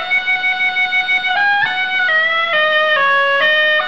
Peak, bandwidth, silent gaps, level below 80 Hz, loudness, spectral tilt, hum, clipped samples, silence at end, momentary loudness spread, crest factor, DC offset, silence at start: -4 dBFS; 8.4 kHz; none; -58 dBFS; -13 LUFS; -1.5 dB/octave; none; under 0.1%; 0 s; 3 LU; 10 dB; 1%; 0 s